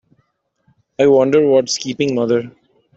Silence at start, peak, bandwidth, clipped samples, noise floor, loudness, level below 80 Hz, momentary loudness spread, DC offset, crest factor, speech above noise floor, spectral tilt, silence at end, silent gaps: 1 s; -2 dBFS; 8.2 kHz; under 0.1%; -64 dBFS; -15 LUFS; -60 dBFS; 11 LU; under 0.1%; 14 dB; 50 dB; -5 dB/octave; 0.45 s; none